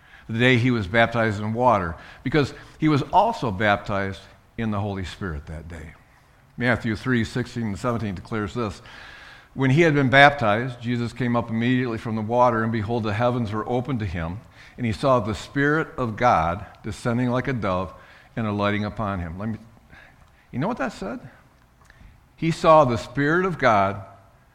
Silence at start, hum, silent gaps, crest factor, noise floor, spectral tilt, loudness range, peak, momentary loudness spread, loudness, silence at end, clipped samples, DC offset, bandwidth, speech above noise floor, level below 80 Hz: 0.15 s; none; none; 24 dB; -55 dBFS; -6.5 dB/octave; 8 LU; 0 dBFS; 15 LU; -22 LUFS; 0.45 s; under 0.1%; under 0.1%; 12 kHz; 32 dB; -46 dBFS